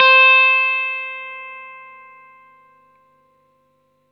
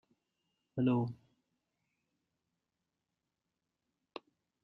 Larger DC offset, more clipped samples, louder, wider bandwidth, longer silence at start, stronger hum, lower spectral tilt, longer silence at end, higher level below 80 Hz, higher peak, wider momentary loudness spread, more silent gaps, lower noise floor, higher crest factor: neither; neither; first, -12 LUFS vs -35 LUFS; first, 6 kHz vs 5.4 kHz; second, 0 s vs 0.75 s; first, 50 Hz at -75 dBFS vs none; second, 0 dB/octave vs -10 dB/octave; second, 2.35 s vs 3.5 s; second, -84 dBFS vs -78 dBFS; first, 0 dBFS vs -20 dBFS; first, 26 LU vs 20 LU; neither; second, -62 dBFS vs -88 dBFS; about the same, 18 dB vs 22 dB